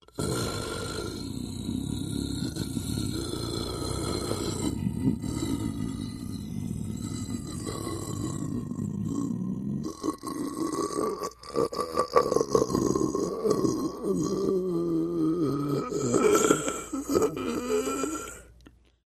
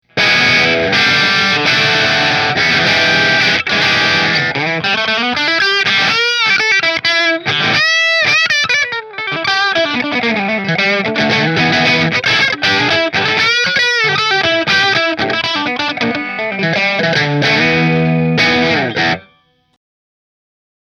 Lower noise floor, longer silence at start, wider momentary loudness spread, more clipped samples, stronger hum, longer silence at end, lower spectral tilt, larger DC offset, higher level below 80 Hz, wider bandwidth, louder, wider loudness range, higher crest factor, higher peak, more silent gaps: about the same, -56 dBFS vs -54 dBFS; about the same, 0.15 s vs 0.15 s; first, 9 LU vs 5 LU; neither; neither; second, 0.4 s vs 1.65 s; first, -5.5 dB/octave vs -3.5 dB/octave; neither; about the same, -48 dBFS vs -50 dBFS; second, 13.5 kHz vs 15 kHz; second, -30 LUFS vs -11 LUFS; first, 7 LU vs 3 LU; first, 24 dB vs 14 dB; second, -6 dBFS vs 0 dBFS; neither